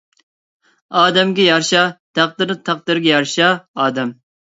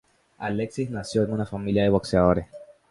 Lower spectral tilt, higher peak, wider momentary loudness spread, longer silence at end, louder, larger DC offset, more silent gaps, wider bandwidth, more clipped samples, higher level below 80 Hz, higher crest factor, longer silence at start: second, -3.5 dB/octave vs -7 dB/octave; first, 0 dBFS vs -4 dBFS; about the same, 8 LU vs 9 LU; about the same, 0.35 s vs 0.25 s; first, -15 LUFS vs -25 LUFS; neither; first, 1.99-2.14 s, 3.68-3.74 s vs none; second, 8 kHz vs 11.5 kHz; neither; second, -66 dBFS vs -44 dBFS; about the same, 18 dB vs 20 dB; first, 0.9 s vs 0.4 s